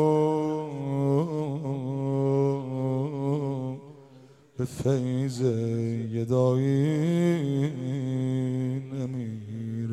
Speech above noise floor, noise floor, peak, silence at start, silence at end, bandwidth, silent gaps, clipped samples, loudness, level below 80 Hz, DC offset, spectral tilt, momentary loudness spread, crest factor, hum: 27 dB; -53 dBFS; -12 dBFS; 0 s; 0 s; 12 kHz; none; under 0.1%; -28 LUFS; -64 dBFS; under 0.1%; -8.5 dB/octave; 9 LU; 16 dB; none